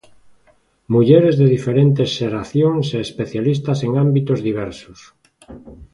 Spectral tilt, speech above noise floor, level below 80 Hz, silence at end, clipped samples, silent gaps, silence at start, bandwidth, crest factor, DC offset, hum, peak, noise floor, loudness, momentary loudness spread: -8 dB/octave; 41 dB; -50 dBFS; 0.1 s; under 0.1%; none; 0.9 s; 10.5 kHz; 16 dB; under 0.1%; none; 0 dBFS; -57 dBFS; -17 LUFS; 12 LU